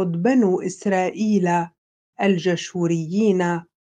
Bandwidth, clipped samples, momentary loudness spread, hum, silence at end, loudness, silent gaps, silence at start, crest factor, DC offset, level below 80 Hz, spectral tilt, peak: 9.4 kHz; under 0.1%; 5 LU; none; 0.25 s; -21 LUFS; 1.78-2.13 s; 0 s; 14 dB; under 0.1%; -70 dBFS; -6.5 dB/octave; -6 dBFS